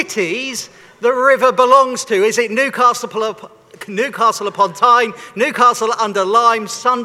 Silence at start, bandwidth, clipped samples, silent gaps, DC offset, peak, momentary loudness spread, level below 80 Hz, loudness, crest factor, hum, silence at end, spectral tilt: 0 s; 15.5 kHz; under 0.1%; none; under 0.1%; 0 dBFS; 11 LU; -66 dBFS; -14 LUFS; 14 dB; none; 0 s; -2.5 dB/octave